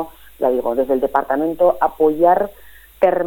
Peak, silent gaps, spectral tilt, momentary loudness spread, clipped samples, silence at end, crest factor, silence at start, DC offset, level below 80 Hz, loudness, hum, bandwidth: -2 dBFS; none; -7 dB/octave; 6 LU; under 0.1%; 0 s; 16 dB; 0 s; under 0.1%; -48 dBFS; -17 LUFS; none; 17.5 kHz